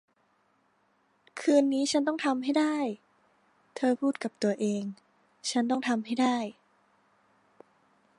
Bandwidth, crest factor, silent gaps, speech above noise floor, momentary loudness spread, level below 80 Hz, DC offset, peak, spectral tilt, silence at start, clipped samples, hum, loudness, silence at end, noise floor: 11.5 kHz; 20 dB; none; 42 dB; 12 LU; -82 dBFS; under 0.1%; -12 dBFS; -4 dB/octave; 1.35 s; under 0.1%; none; -29 LUFS; 1.65 s; -70 dBFS